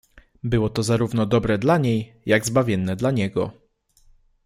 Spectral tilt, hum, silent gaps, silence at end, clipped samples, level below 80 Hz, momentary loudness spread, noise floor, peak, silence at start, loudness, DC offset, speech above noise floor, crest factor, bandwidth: -6 dB/octave; none; none; 0.95 s; under 0.1%; -46 dBFS; 7 LU; -57 dBFS; -4 dBFS; 0.45 s; -22 LUFS; under 0.1%; 36 dB; 18 dB; 16 kHz